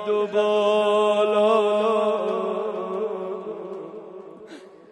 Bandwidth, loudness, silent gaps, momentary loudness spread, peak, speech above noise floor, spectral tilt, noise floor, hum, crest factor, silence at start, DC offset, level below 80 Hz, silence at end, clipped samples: 9.4 kHz; -22 LUFS; none; 21 LU; -8 dBFS; 24 dB; -5 dB/octave; -43 dBFS; none; 14 dB; 0 s; under 0.1%; -82 dBFS; 0.25 s; under 0.1%